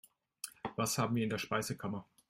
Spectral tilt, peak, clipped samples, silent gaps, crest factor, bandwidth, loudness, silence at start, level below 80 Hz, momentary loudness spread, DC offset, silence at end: -4.5 dB/octave; -20 dBFS; under 0.1%; none; 18 dB; 16 kHz; -37 LUFS; 0.45 s; -70 dBFS; 12 LU; under 0.1%; 0.25 s